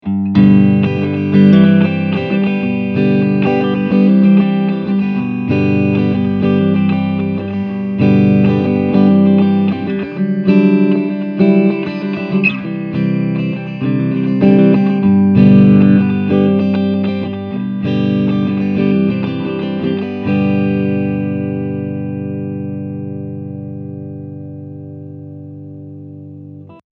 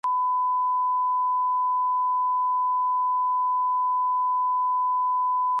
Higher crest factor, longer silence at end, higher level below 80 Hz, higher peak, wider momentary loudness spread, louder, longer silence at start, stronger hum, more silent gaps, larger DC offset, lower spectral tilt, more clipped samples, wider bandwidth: first, 14 dB vs 4 dB; first, 0.15 s vs 0 s; first, -50 dBFS vs under -90 dBFS; first, 0 dBFS vs -20 dBFS; first, 18 LU vs 0 LU; first, -13 LUFS vs -23 LUFS; about the same, 0.05 s vs 0.05 s; first, 50 Hz at -40 dBFS vs 50 Hz at -105 dBFS; neither; neither; first, -10.5 dB/octave vs -1 dB/octave; neither; first, 5 kHz vs 2 kHz